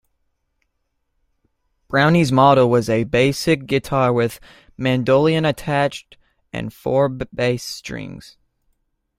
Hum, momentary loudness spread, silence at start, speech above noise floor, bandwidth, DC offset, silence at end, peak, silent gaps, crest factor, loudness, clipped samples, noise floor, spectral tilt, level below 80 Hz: none; 16 LU; 1.9 s; 54 dB; 16 kHz; under 0.1%; 1 s; -2 dBFS; none; 18 dB; -18 LUFS; under 0.1%; -71 dBFS; -6 dB/octave; -48 dBFS